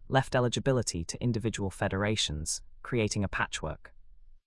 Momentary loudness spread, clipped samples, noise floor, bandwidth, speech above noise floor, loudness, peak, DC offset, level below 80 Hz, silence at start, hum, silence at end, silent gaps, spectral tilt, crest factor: 7 LU; under 0.1%; -51 dBFS; 12 kHz; 21 dB; -31 LUFS; -10 dBFS; under 0.1%; -48 dBFS; 0 s; none; 0.1 s; none; -4.5 dB/octave; 20 dB